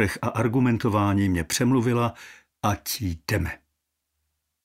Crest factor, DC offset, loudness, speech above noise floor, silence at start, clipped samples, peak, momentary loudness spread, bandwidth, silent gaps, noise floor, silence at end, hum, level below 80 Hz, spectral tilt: 18 dB; under 0.1%; -24 LUFS; 55 dB; 0 s; under 0.1%; -8 dBFS; 7 LU; 16 kHz; none; -79 dBFS; 1.1 s; none; -46 dBFS; -5.5 dB/octave